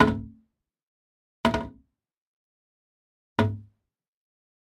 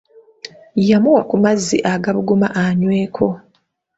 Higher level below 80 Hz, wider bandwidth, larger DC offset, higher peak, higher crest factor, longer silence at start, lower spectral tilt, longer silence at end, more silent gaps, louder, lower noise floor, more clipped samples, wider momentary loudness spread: about the same, -50 dBFS vs -54 dBFS; first, 12.5 kHz vs 8 kHz; neither; about the same, -2 dBFS vs -2 dBFS; first, 28 dB vs 16 dB; second, 0 s vs 0.45 s; about the same, -6.5 dB/octave vs -6 dB/octave; first, 1.1 s vs 0.6 s; first, 0.83-1.44 s, 2.17-3.36 s vs none; second, -28 LUFS vs -16 LUFS; first, -75 dBFS vs -62 dBFS; neither; about the same, 16 LU vs 17 LU